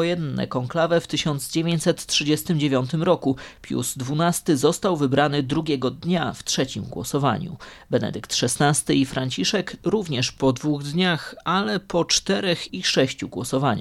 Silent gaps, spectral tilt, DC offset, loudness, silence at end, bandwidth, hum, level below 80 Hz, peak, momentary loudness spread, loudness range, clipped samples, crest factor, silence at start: none; -4.5 dB/octave; under 0.1%; -23 LUFS; 0 s; 15.5 kHz; none; -52 dBFS; -6 dBFS; 6 LU; 2 LU; under 0.1%; 16 dB; 0 s